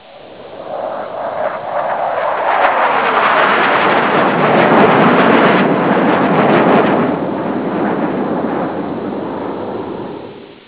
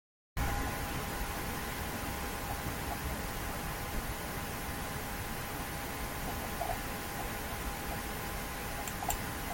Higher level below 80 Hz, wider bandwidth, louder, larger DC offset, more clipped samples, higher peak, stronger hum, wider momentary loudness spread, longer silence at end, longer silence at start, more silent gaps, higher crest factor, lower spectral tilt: second, -52 dBFS vs -44 dBFS; second, 4 kHz vs 17 kHz; first, -13 LUFS vs -38 LUFS; first, 0.2% vs under 0.1%; neither; first, 0 dBFS vs -18 dBFS; neither; first, 14 LU vs 3 LU; about the same, 0.1 s vs 0 s; second, 0.05 s vs 0.35 s; neither; second, 14 dB vs 20 dB; first, -9.5 dB/octave vs -4 dB/octave